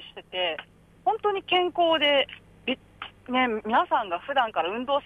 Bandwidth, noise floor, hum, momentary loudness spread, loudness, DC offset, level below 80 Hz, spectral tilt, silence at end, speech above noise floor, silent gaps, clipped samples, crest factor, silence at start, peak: 10 kHz; -45 dBFS; 50 Hz at -60 dBFS; 13 LU; -26 LUFS; under 0.1%; -62 dBFS; -5 dB/octave; 0.05 s; 20 dB; none; under 0.1%; 16 dB; 0 s; -10 dBFS